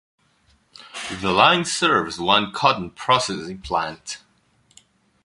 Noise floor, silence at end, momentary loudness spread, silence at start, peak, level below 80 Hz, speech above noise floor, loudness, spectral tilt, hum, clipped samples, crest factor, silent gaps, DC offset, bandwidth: -61 dBFS; 1.05 s; 18 LU; 0.8 s; 0 dBFS; -52 dBFS; 41 dB; -20 LUFS; -3 dB/octave; none; under 0.1%; 22 dB; none; under 0.1%; 11.5 kHz